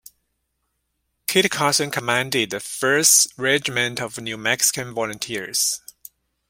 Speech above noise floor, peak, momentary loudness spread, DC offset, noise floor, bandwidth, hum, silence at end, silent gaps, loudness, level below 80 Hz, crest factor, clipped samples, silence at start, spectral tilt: 53 dB; -2 dBFS; 13 LU; under 0.1%; -74 dBFS; 16.5 kHz; none; 0.7 s; none; -19 LUFS; -62 dBFS; 22 dB; under 0.1%; 1.3 s; -1.5 dB/octave